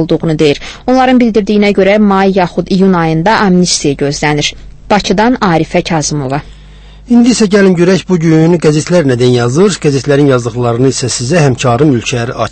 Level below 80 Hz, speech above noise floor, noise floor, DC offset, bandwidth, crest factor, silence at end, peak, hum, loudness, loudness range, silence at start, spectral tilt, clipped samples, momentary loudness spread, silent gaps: -34 dBFS; 24 dB; -33 dBFS; under 0.1%; 8.8 kHz; 8 dB; 0 s; 0 dBFS; none; -9 LUFS; 3 LU; 0 s; -5.5 dB/octave; 0.4%; 6 LU; none